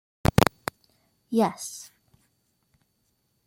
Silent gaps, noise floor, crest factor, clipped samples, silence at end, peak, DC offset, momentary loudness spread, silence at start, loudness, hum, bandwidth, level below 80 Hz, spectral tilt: none; -73 dBFS; 28 dB; under 0.1%; 1.65 s; 0 dBFS; under 0.1%; 17 LU; 0.4 s; -26 LUFS; none; 16.5 kHz; -44 dBFS; -5.5 dB/octave